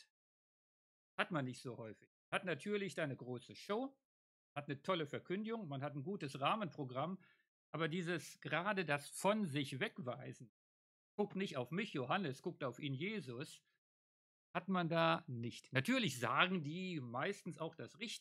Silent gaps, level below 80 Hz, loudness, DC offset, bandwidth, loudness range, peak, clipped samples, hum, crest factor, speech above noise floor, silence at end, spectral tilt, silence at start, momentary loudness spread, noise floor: 2.07-2.32 s, 4.05-4.56 s, 7.48-7.73 s, 10.49-11.18 s, 13.78-14.54 s; under -90 dBFS; -42 LUFS; under 0.1%; 15.5 kHz; 6 LU; -16 dBFS; under 0.1%; none; 28 dB; over 48 dB; 0 s; -5 dB/octave; 1.2 s; 13 LU; under -90 dBFS